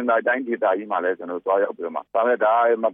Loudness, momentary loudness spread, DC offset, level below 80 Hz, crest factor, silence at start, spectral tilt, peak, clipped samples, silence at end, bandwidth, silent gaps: -22 LUFS; 8 LU; under 0.1%; -80 dBFS; 14 dB; 0 s; -8.5 dB/octave; -8 dBFS; under 0.1%; 0 s; 3.7 kHz; none